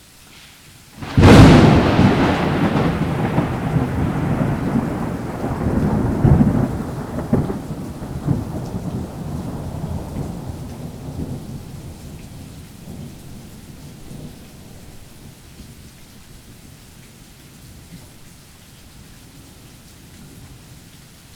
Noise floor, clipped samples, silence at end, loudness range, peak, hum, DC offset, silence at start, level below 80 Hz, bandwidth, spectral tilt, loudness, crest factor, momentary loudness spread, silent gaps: -44 dBFS; under 0.1%; 0.6 s; 26 LU; 0 dBFS; none; under 0.1%; 0.45 s; -32 dBFS; 17 kHz; -7 dB/octave; -17 LUFS; 20 dB; 25 LU; none